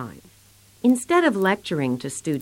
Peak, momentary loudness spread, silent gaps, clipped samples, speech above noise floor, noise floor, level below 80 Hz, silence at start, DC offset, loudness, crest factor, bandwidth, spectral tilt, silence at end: -6 dBFS; 9 LU; none; under 0.1%; 32 dB; -53 dBFS; -62 dBFS; 0 s; under 0.1%; -22 LUFS; 16 dB; 16.5 kHz; -5 dB/octave; 0 s